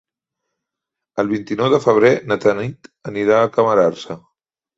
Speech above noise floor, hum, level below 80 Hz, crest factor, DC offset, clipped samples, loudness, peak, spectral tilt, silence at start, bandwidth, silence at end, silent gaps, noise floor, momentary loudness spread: 67 dB; none; -58 dBFS; 16 dB; under 0.1%; under 0.1%; -16 LUFS; -2 dBFS; -6.5 dB/octave; 1.15 s; 7.8 kHz; 0.6 s; none; -83 dBFS; 17 LU